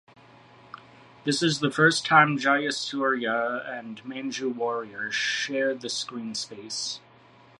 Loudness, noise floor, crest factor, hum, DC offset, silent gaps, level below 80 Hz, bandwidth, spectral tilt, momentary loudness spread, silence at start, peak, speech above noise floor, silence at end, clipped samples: -25 LUFS; -54 dBFS; 22 dB; none; under 0.1%; none; -74 dBFS; 11.5 kHz; -3.5 dB/octave; 15 LU; 0.75 s; -6 dBFS; 28 dB; 0.6 s; under 0.1%